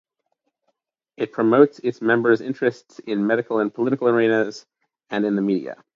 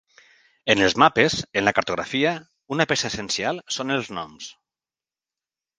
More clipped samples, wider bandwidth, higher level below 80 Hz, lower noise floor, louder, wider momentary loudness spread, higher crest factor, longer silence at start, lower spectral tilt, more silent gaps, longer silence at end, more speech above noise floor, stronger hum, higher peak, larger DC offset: neither; second, 7.4 kHz vs 10 kHz; second, -72 dBFS vs -56 dBFS; second, -75 dBFS vs under -90 dBFS; about the same, -21 LUFS vs -22 LUFS; second, 11 LU vs 16 LU; about the same, 20 dB vs 24 dB; first, 1.2 s vs 0.65 s; first, -7 dB/octave vs -3.5 dB/octave; neither; second, 0.2 s vs 1.25 s; second, 54 dB vs over 68 dB; neither; about the same, 0 dBFS vs 0 dBFS; neither